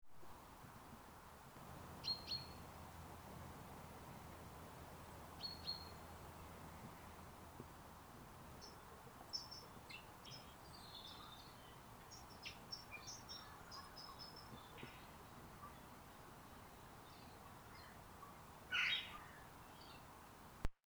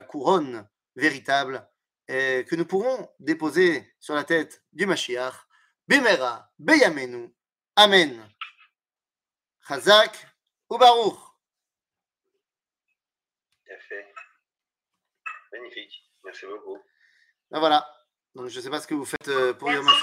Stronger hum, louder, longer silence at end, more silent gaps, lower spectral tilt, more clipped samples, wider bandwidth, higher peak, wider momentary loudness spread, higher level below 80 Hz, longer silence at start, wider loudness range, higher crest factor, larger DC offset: neither; second, -52 LUFS vs -22 LUFS; first, 0.15 s vs 0 s; neither; about the same, -3 dB/octave vs -3 dB/octave; neither; first, over 20 kHz vs 16 kHz; second, -26 dBFS vs -2 dBFS; second, 12 LU vs 23 LU; first, -64 dBFS vs -78 dBFS; second, 0 s vs 0.15 s; second, 10 LU vs 21 LU; about the same, 26 dB vs 22 dB; neither